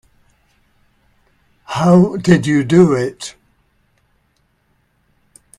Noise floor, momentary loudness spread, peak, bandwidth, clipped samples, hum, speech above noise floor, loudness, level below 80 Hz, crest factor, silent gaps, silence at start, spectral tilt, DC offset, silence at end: -62 dBFS; 15 LU; 0 dBFS; 10.5 kHz; under 0.1%; none; 49 dB; -13 LUFS; -52 dBFS; 18 dB; none; 1.7 s; -7 dB/octave; under 0.1%; 2.3 s